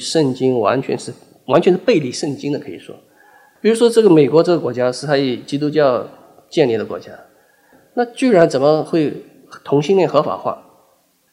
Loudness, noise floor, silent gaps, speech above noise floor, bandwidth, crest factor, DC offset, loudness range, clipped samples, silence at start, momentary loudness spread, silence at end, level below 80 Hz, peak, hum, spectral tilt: -16 LUFS; -58 dBFS; none; 42 dB; 14 kHz; 16 dB; under 0.1%; 4 LU; under 0.1%; 0 s; 15 LU; 0.75 s; -64 dBFS; 0 dBFS; none; -6 dB/octave